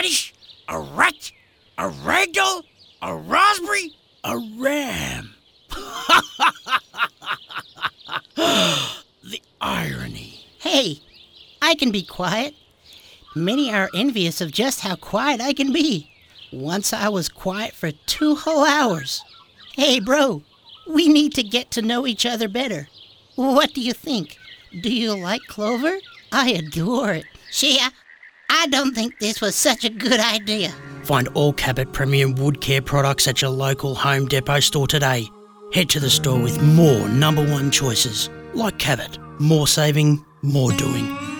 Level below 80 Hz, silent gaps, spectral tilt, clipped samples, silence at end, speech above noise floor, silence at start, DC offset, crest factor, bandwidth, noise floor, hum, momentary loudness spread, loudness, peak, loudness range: -48 dBFS; none; -4 dB/octave; under 0.1%; 0 s; 29 dB; 0 s; under 0.1%; 18 dB; over 20 kHz; -48 dBFS; none; 14 LU; -19 LUFS; -2 dBFS; 5 LU